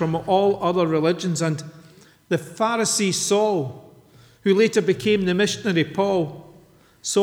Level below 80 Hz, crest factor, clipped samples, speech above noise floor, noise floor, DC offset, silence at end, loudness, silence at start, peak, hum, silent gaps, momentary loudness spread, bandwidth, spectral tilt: -60 dBFS; 16 dB; under 0.1%; 32 dB; -52 dBFS; under 0.1%; 0 s; -21 LUFS; 0 s; -6 dBFS; none; none; 8 LU; 17 kHz; -4.5 dB/octave